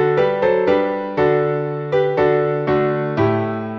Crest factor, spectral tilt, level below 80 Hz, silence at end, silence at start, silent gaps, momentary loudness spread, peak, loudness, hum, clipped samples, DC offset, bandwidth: 14 dB; -9 dB/octave; -50 dBFS; 0 s; 0 s; none; 4 LU; -4 dBFS; -18 LUFS; none; under 0.1%; under 0.1%; 6.2 kHz